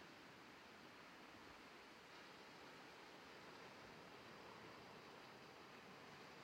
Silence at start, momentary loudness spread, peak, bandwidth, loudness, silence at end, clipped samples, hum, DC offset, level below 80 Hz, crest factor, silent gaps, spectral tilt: 0 s; 2 LU; -48 dBFS; 16 kHz; -60 LUFS; 0 s; under 0.1%; none; under 0.1%; -86 dBFS; 14 dB; none; -3.5 dB/octave